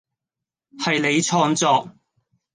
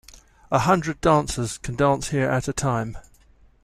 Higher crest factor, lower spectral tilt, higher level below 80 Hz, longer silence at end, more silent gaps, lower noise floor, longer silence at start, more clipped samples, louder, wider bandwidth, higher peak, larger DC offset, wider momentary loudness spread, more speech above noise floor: about the same, 18 dB vs 20 dB; second, -3.5 dB/octave vs -5.5 dB/octave; second, -68 dBFS vs -44 dBFS; about the same, 0.65 s vs 0.65 s; neither; first, -87 dBFS vs -55 dBFS; first, 0.75 s vs 0.15 s; neither; first, -19 LUFS vs -23 LUFS; second, 10 kHz vs 14.5 kHz; about the same, -6 dBFS vs -4 dBFS; neither; second, 4 LU vs 8 LU; first, 67 dB vs 33 dB